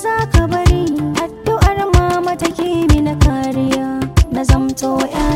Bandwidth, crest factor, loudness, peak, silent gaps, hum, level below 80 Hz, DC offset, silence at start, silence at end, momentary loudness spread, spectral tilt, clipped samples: 16.5 kHz; 14 dB; -15 LUFS; 0 dBFS; none; none; -20 dBFS; under 0.1%; 0 s; 0 s; 5 LU; -6 dB/octave; under 0.1%